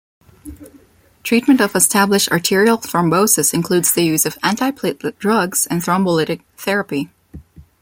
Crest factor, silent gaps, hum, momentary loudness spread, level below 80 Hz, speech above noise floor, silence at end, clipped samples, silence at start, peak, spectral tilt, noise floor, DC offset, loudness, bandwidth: 18 dB; none; none; 10 LU; -52 dBFS; 23 dB; 0.2 s; under 0.1%; 0.45 s; 0 dBFS; -3.5 dB/octave; -39 dBFS; under 0.1%; -16 LUFS; 17 kHz